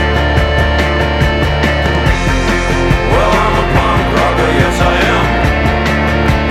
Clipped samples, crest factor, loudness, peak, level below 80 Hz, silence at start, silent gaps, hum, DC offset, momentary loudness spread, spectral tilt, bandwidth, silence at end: under 0.1%; 10 dB; -12 LUFS; 0 dBFS; -18 dBFS; 0 s; none; none; under 0.1%; 2 LU; -6 dB/octave; 14.5 kHz; 0 s